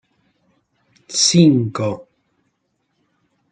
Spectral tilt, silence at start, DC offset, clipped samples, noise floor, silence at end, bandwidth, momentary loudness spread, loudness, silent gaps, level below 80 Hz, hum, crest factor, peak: -4.5 dB/octave; 1.1 s; under 0.1%; under 0.1%; -70 dBFS; 1.5 s; 9.4 kHz; 13 LU; -15 LUFS; none; -60 dBFS; none; 18 dB; -2 dBFS